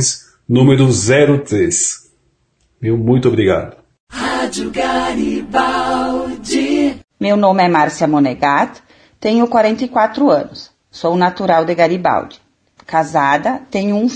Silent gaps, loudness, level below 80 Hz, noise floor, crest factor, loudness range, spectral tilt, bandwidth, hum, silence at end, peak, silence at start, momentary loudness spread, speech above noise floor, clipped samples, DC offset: 4.00-4.07 s; -14 LUFS; -46 dBFS; -60 dBFS; 14 dB; 3 LU; -5 dB/octave; 10.5 kHz; none; 0 s; 0 dBFS; 0 s; 10 LU; 47 dB; under 0.1%; under 0.1%